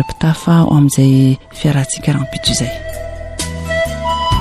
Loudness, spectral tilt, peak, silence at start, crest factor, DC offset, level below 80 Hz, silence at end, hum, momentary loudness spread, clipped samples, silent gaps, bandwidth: -14 LUFS; -5.5 dB/octave; -2 dBFS; 0 s; 12 dB; under 0.1%; -32 dBFS; 0 s; none; 13 LU; under 0.1%; none; 14 kHz